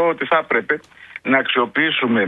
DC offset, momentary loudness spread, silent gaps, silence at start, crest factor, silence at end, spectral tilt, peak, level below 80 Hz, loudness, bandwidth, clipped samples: under 0.1%; 8 LU; none; 0 s; 18 dB; 0 s; -6.5 dB/octave; -2 dBFS; -64 dBFS; -18 LUFS; 4.9 kHz; under 0.1%